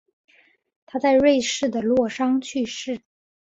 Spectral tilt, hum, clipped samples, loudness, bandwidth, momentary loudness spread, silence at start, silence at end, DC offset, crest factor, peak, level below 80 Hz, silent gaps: -3.5 dB/octave; none; under 0.1%; -22 LUFS; 8 kHz; 14 LU; 0.95 s; 0.45 s; under 0.1%; 16 dB; -8 dBFS; -58 dBFS; none